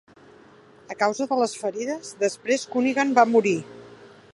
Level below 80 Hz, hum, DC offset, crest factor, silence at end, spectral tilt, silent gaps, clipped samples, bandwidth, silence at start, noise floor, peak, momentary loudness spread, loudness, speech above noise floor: -74 dBFS; none; under 0.1%; 20 dB; 0.4 s; -4 dB/octave; none; under 0.1%; 11.5 kHz; 0.9 s; -51 dBFS; -4 dBFS; 12 LU; -23 LUFS; 29 dB